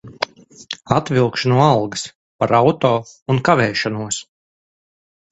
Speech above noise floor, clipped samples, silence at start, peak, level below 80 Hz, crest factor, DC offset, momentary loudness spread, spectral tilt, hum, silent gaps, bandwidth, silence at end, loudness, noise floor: over 73 dB; under 0.1%; 0.05 s; 0 dBFS; -52 dBFS; 18 dB; under 0.1%; 13 LU; -5.5 dB/octave; none; 2.15-2.39 s, 3.22-3.26 s; 8.2 kHz; 1.1 s; -18 LUFS; under -90 dBFS